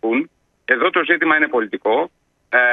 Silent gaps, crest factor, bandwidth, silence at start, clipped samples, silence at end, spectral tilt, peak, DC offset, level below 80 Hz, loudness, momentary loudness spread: none; 18 dB; 4.4 kHz; 0.05 s; under 0.1%; 0 s; -6.5 dB/octave; 0 dBFS; under 0.1%; -70 dBFS; -17 LUFS; 12 LU